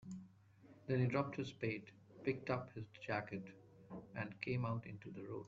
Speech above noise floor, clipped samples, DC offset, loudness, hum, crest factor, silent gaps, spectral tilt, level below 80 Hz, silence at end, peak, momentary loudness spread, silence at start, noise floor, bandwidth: 22 dB; under 0.1%; under 0.1%; -43 LUFS; none; 20 dB; none; -6.5 dB/octave; -74 dBFS; 0 s; -24 dBFS; 17 LU; 0 s; -65 dBFS; 7.4 kHz